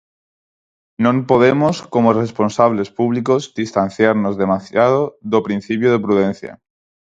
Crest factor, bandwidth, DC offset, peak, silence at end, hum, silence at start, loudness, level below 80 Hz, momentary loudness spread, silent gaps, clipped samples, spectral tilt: 16 dB; 7.8 kHz; under 0.1%; 0 dBFS; 0.55 s; none; 1 s; -16 LUFS; -54 dBFS; 6 LU; none; under 0.1%; -7 dB/octave